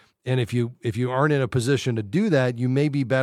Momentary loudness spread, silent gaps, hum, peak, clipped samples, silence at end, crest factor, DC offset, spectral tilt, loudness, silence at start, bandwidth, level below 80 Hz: 5 LU; none; none; -6 dBFS; under 0.1%; 0 s; 16 dB; under 0.1%; -7 dB/octave; -23 LUFS; 0.25 s; 12.5 kHz; -58 dBFS